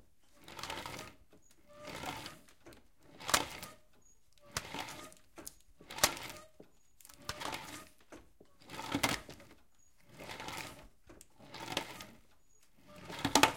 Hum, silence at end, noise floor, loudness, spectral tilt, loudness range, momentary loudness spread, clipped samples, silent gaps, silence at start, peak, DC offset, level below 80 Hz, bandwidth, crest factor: none; 0 s; -70 dBFS; -39 LUFS; -2 dB/octave; 7 LU; 26 LU; under 0.1%; none; 0.4 s; -6 dBFS; under 0.1%; -64 dBFS; 17 kHz; 34 dB